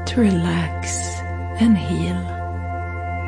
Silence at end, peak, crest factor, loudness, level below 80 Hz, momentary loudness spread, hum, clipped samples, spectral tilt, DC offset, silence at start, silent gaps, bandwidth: 0 s; -6 dBFS; 14 dB; -22 LUFS; -36 dBFS; 10 LU; none; under 0.1%; -5.5 dB/octave; under 0.1%; 0 s; none; 10.5 kHz